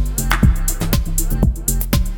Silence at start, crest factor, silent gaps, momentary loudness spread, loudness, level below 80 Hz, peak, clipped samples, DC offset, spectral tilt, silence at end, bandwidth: 0 s; 16 dB; none; 4 LU; -18 LUFS; -18 dBFS; 0 dBFS; under 0.1%; under 0.1%; -4.5 dB/octave; 0 s; 18.5 kHz